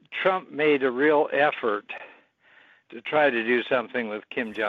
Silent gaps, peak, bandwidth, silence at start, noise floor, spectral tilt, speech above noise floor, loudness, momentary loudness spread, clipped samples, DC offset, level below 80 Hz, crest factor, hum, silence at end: none; -8 dBFS; 5.2 kHz; 0.1 s; -58 dBFS; -6.5 dB/octave; 34 dB; -24 LUFS; 10 LU; under 0.1%; under 0.1%; -76 dBFS; 18 dB; none; 0 s